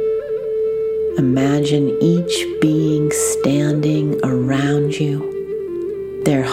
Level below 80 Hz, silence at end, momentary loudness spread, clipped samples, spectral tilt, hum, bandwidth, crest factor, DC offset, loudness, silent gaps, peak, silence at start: -48 dBFS; 0 s; 8 LU; under 0.1%; -6 dB/octave; none; 16 kHz; 14 dB; under 0.1%; -18 LUFS; none; -2 dBFS; 0 s